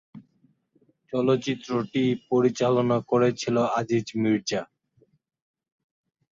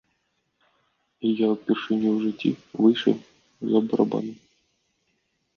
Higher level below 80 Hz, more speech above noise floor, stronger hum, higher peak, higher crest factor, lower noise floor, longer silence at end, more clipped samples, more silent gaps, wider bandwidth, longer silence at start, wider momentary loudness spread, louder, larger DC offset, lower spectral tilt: first, -66 dBFS vs -72 dBFS; second, 42 dB vs 50 dB; neither; about the same, -8 dBFS vs -6 dBFS; about the same, 18 dB vs 20 dB; second, -66 dBFS vs -73 dBFS; first, 1.7 s vs 1.25 s; neither; neither; first, 7.6 kHz vs 6.8 kHz; second, 0.15 s vs 1.2 s; second, 7 LU vs 10 LU; about the same, -25 LUFS vs -24 LUFS; neither; second, -6 dB/octave vs -7.5 dB/octave